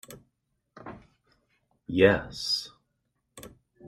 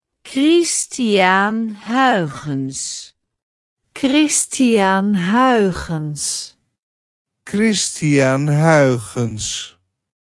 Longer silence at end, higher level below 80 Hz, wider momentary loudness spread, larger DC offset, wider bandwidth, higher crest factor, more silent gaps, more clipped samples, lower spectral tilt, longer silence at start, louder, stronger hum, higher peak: second, 0 s vs 0.65 s; second, -58 dBFS vs -50 dBFS; first, 27 LU vs 11 LU; neither; first, 15 kHz vs 12 kHz; first, 24 dB vs 16 dB; second, none vs 3.43-3.76 s, 6.82-7.25 s; neither; about the same, -4.5 dB/octave vs -4.5 dB/octave; second, 0.1 s vs 0.25 s; second, -25 LUFS vs -16 LUFS; neither; second, -6 dBFS vs 0 dBFS